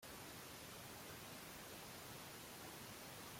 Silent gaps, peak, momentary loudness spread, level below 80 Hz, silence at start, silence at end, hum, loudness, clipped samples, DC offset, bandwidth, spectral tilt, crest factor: none; -42 dBFS; 0 LU; -74 dBFS; 0 s; 0 s; none; -53 LUFS; under 0.1%; under 0.1%; 16.5 kHz; -2.5 dB/octave; 12 dB